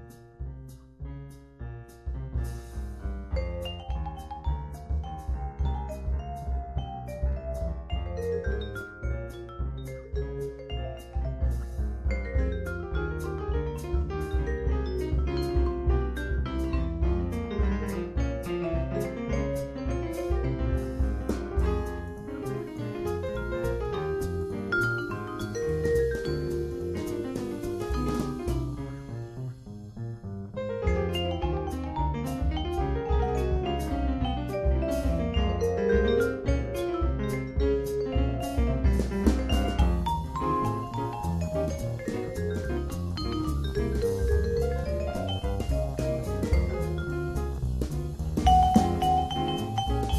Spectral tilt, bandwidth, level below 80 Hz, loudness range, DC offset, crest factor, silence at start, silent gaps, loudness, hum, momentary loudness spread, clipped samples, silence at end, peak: -7 dB/octave; 14 kHz; -32 dBFS; 7 LU; under 0.1%; 22 dB; 0 s; none; -30 LUFS; none; 10 LU; under 0.1%; 0 s; -8 dBFS